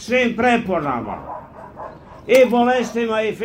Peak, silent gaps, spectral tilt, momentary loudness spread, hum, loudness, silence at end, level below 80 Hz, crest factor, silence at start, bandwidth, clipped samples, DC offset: -2 dBFS; none; -5 dB/octave; 22 LU; none; -17 LUFS; 0 s; -50 dBFS; 18 dB; 0 s; 16 kHz; under 0.1%; under 0.1%